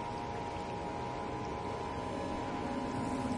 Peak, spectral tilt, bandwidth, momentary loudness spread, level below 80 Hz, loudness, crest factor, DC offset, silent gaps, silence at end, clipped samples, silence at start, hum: -24 dBFS; -6 dB/octave; 11.5 kHz; 3 LU; -54 dBFS; -39 LUFS; 14 dB; under 0.1%; none; 0 s; under 0.1%; 0 s; none